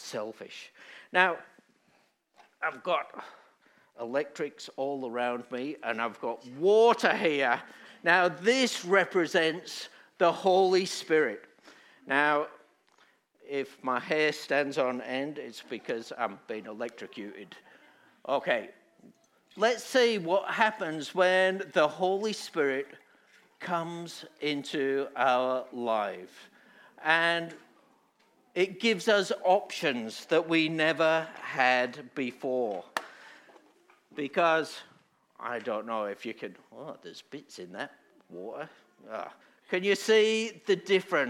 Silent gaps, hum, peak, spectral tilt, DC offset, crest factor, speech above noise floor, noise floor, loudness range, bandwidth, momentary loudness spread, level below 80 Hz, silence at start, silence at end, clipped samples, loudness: none; none; -6 dBFS; -4 dB/octave; under 0.1%; 24 dB; 40 dB; -69 dBFS; 10 LU; 15.5 kHz; 19 LU; under -90 dBFS; 0 s; 0 s; under 0.1%; -29 LUFS